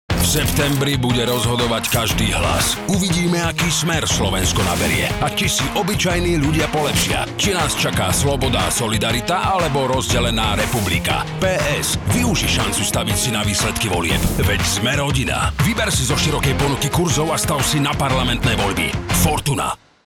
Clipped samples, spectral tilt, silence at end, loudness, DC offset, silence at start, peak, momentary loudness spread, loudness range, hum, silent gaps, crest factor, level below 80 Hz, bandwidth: under 0.1%; -4 dB/octave; 0.3 s; -18 LUFS; under 0.1%; 0.1 s; -4 dBFS; 2 LU; 1 LU; none; none; 14 dB; -30 dBFS; 19.5 kHz